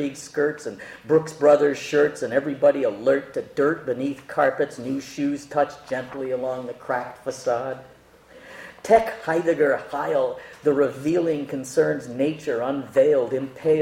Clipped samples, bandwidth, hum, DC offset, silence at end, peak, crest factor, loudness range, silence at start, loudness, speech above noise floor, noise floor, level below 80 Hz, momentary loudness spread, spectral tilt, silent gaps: under 0.1%; 15.5 kHz; none; under 0.1%; 0 s; -4 dBFS; 18 dB; 6 LU; 0 s; -23 LUFS; 27 dB; -50 dBFS; -62 dBFS; 11 LU; -5.5 dB/octave; none